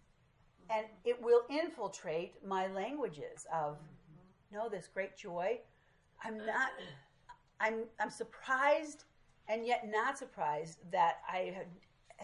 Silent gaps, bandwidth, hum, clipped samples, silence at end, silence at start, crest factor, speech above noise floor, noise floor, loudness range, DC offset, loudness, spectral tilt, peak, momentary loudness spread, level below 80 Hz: none; 11 kHz; none; under 0.1%; 0 s; 0.7 s; 20 dB; 32 dB; -69 dBFS; 6 LU; under 0.1%; -37 LUFS; -4 dB/octave; -18 dBFS; 17 LU; -76 dBFS